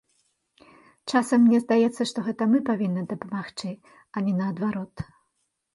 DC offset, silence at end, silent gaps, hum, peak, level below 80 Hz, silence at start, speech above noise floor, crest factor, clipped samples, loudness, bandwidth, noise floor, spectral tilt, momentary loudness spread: under 0.1%; 0.7 s; none; none; -10 dBFS; -62 dBFS; 1.05 s; 52 dB; 16 dB; under 0.1%; -24 LUFS; 11.5 kHz; -76 dBFS; -6.5 dB/octave; 18 LU